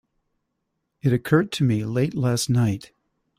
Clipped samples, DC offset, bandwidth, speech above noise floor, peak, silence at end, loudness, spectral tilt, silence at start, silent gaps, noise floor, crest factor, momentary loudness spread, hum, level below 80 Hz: under 0.1%; under 0.1%; 16 kHz; 56 dB; -4 dBFS; 0.55 s; -22 LUFS; -6 dB/octave; 1.05 s; none; -77 dBFS; 20 dB; 5 LU; none; -56 dBFS